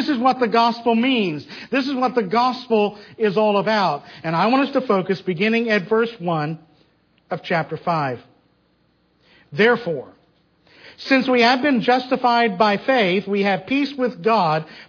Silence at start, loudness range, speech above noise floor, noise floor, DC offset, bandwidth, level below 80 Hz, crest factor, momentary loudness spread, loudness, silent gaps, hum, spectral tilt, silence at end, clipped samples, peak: 0 s; 7 LU; 43 dB; -62 dBFS; under 0.1%; 5.4 kHz; -68 dBFS; 16 dB; 8 LU; -19 LUFS; none; none; -6.5 dB/octave; 0.05 s; under 0.1%; -4 dBFS